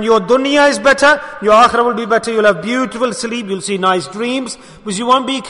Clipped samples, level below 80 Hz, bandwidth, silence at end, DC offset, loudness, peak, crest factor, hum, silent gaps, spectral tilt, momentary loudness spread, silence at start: under 0.1%; -48 dBFS; 11 kHz; 0 s; under 0.1%; -13 LUFS; 0 dBFS; 14 dB; none; none; -3.5 dB/octave; 11 LU; 0 s